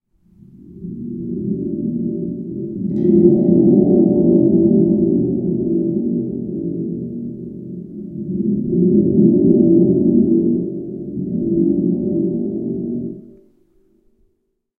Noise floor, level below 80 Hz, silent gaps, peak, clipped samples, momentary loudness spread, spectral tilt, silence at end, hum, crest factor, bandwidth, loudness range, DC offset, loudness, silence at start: -68 dBFS; -48 dBFS; none; 0 dBFS; under 0.1%; 16 LU; -15.5 dB/octave; 1.5 s; none; 16 dB; 1 kHz; 8 LU; under 0.1%; -16 LUFS; 0.6 s